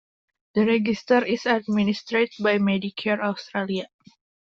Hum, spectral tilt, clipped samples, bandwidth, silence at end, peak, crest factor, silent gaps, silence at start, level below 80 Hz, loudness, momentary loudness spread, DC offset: none; -6.5 dB/octave; under 0.1%; 7.2 kHz; 0.7 s; -6 dBFS; 18 dB; none; 0.55 s; -64 dBFS; -23 LUFS; 8 LU; under 0.1%